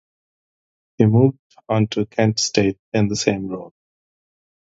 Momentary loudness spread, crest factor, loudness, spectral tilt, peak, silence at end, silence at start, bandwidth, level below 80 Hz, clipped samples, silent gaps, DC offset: 9 LU; 20 dB; -19 LUFS; -5.5 dB/octave; 0 dBFS; 1.1 s; 1 s; 7.8 kHz; -52 dBFS; under 0.1%; 1.39-1.50 s, 2.79-2.92 s; under 0.1%